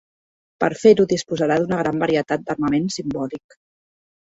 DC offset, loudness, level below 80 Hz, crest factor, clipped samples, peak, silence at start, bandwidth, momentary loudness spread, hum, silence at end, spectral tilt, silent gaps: under 0.1%; -20 LUFS; -56 dBFS; 20 dB; under 0.1%; -2 dBFS; 0.6 s; 8 kHz; 12 LU; none; 1 s; -5.5 dB/octave; none